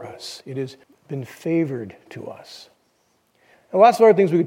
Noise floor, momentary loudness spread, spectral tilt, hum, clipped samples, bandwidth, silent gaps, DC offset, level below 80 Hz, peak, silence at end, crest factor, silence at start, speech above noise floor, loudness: -65 dBFS; 23 LU; -6.5 dB/octave; none; under 0.1%; 16 kHz; none; under 0.1%; -74 dBFS; -2 dBFS; 0 s; 20 dB; 0 s; 45 dB; -18 LUFS